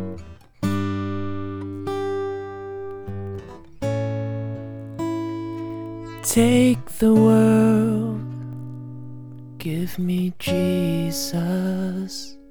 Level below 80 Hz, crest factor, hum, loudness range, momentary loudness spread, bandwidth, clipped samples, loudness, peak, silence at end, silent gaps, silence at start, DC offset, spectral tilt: -50 dBFS; 18 dB; none; 10 LU; 18 LU; over 20 kHz; under 0.1%; -23 LUFS; -4 dBFS; 0 s; none; 0 s; under 0.1%; -6 dB/octave